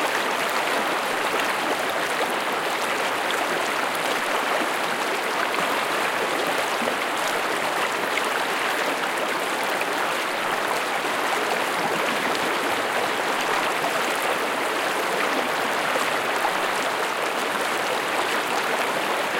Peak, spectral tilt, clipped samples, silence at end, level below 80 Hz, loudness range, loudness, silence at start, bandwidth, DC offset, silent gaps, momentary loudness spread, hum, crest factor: -8 dBFS; -1.5 dB/octave; under 0.1%; 0 s; -68 dBFS; 1 LU; -23 LUFS; 0 s; 17 kHz; under 0.1%; none; 1 LU; none; 16 dB